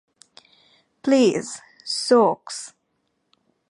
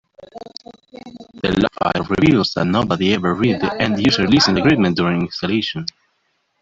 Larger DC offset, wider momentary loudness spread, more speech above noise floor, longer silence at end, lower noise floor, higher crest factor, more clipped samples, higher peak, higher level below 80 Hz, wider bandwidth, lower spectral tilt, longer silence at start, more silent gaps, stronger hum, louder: neither; about the same, 18 LU vs 20 LU; about the same, 53 dB vs 50 dB; first, 1 s vs 0.75 s; first, -72 dBFS vs -67 dBFS; about the same, 18 dB vs 16 dB; neither; about the same, -4 dBFS vs -2 dBFS; second, -74 dBFS vs -46 dBFS; first, 11.5 kHz vs 7.8 kHz; second, -4 dB/octave vs -6 dB/octave; first, 1.05 s vs 0.2 s; neither; neither; second, -20 LUFS vs -17 LUFS